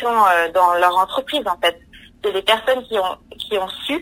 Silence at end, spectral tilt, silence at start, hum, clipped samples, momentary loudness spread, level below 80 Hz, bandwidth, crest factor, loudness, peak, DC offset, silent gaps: 0 s; -2.5 dB/octave; 0 s; none; under 0.1%; 10 LU; -52 dBFS; 16 kHz; 16 dB; -18 LUFS; -2 dBFS; under 0.1%; none